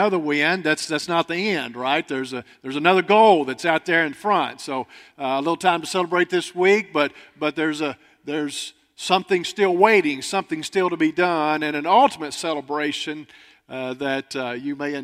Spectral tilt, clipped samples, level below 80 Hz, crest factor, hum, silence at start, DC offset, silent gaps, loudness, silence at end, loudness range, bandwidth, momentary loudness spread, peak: -4 dB/octave; under 0.1%; -70 dBFS; 22 dB; none; 0 s; under 0.1%; none; -21 LUFS; 0 s; 3 LU; 15 kHz; 14 LU; 0 dBFS